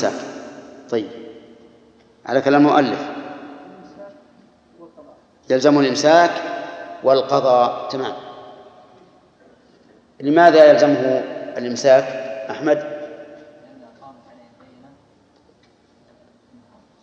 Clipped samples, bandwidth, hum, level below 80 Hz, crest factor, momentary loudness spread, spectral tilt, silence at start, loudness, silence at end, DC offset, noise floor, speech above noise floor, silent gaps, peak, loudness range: under 0.1%; 8 kHz; none; -70 dBFS; 20 dB; 24 LU; -5 dB/octave; 0 s; -16 LUFS; 2.95 s; under 0.1%; -55 dBFS; 41 dB; none; 0 dBFS; 7 LU